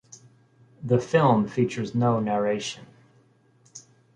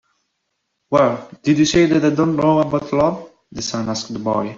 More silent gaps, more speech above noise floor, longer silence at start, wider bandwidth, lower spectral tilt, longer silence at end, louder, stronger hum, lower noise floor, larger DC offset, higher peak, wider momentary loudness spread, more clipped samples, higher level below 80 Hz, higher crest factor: neither; second, 37 dB vs 56 dB; about the same, 0.8 s vs 0.9 s; first, 10 kHz vs 7.6 kHz; about the same, -6.5 dB/octave vs -5.5 dB/octave; first, 0.35 s vs 0 s; second, -24 LUFS vs -18 LUFS; neither; second, -60 dBFS vs -73 dBFS; neither; second, -6 dBFS vs -2 dBFS; first, 26 LU vs 10 LU; neither; second, -62 dBFS vs -50 dBFS; about the same, 20 dB vs 16 dB